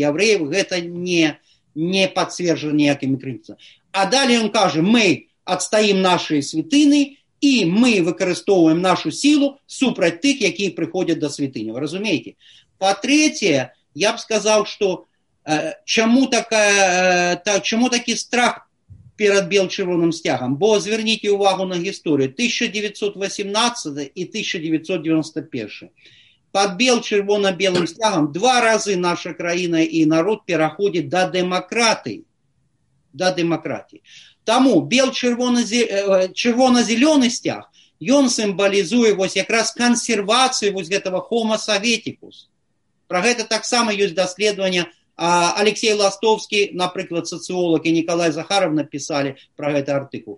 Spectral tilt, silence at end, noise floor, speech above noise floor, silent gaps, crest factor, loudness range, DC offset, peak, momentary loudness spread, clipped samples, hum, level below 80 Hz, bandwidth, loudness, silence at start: -3.5 dB/octave; 0 s; -71 dBFS; 52 dB; none; 18 dB; 4 LU; under 0.1%; 0 dBFS; 9 LU; under 0.1%; none; -66 dBFS; 11.5 kHz; -18 LUFS; 0 s